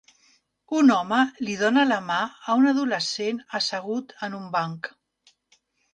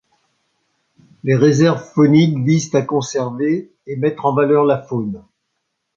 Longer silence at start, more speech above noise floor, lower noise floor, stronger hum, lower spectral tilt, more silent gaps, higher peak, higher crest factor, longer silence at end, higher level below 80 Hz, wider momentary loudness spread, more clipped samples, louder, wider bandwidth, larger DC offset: second, 0.7 s vs 1.25 s; second, 42 dB vs 58 dB; second, -66 dBFS vs -73 dBFS; neither; second, -4 dB/octave vs -7 dB/octave; neither; second, -8 dBFS vs 0 dBFS; about the same, 18 dB vs 16 dB; first, 1.05 s vs 0.8 s; second, -72 dBFS vs -58 dBFS; about the same, 12 LU vs 11 LU; neither; second, -24 LUFS vs -16 LUFS; first, 9.4 kHz vs 7.6 kHz; neither